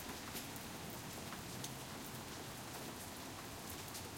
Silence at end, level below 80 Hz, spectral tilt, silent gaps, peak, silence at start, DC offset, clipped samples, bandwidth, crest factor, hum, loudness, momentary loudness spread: 0 s; -66 dBFS; -3 dB/octave; none; -30 dBFS; 0 s; under 0.1%; under 0.1%; 17 kHz; 20 dB; none; -47 LUFS; 2 LU